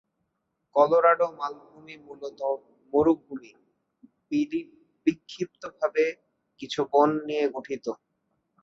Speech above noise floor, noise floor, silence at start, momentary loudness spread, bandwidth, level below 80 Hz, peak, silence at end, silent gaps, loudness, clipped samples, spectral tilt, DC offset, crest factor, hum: 53 dB; -78 dBFS; 0.75 s; 21 LU; 7.6 kHz; -66 dBFS; -8 dBFS; 0.7 s; none; -26 LUFS; under 0.1%; -6 dB/octave; under 0.1%; 20 dB; none